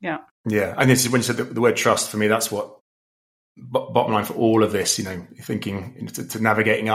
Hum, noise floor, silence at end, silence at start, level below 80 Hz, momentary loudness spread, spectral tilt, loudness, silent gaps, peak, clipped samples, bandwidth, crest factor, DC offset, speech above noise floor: none; under -90 dBFS; 0 s; 0 s; -62 dBFS; 13 LU; -4 dB/octave; -21 LUFS; 0.31-0.44 s, 2.81-3.55 s; -2 dBFS; under 0.1%; 16 kHz; 20 dB; under 0.1%; over 69 dB